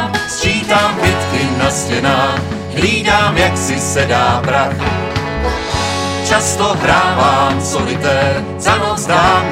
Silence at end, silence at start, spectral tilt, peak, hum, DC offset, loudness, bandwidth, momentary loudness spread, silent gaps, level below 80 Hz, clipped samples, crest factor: 0 s; 0 s; -4 dB/octave; 0 dBFS; none; under 0.1%; -14 LUFS; 16.5 kHz; 6 LU; none; -32 dBFS; under 0.1%; 14 dB